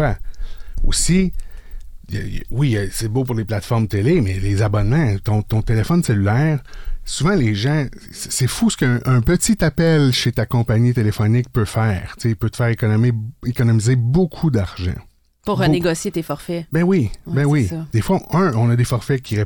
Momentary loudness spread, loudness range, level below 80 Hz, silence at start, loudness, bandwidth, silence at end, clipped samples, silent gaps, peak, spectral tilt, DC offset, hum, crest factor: 10 LU; 4 LU; -30 dBFS; 0 s; -18 LUFS; 19.5 kHz; 0 s; under 0.1%; none; -6 dBFS; -6 dB/octave; under 0.1%; none; 10 dB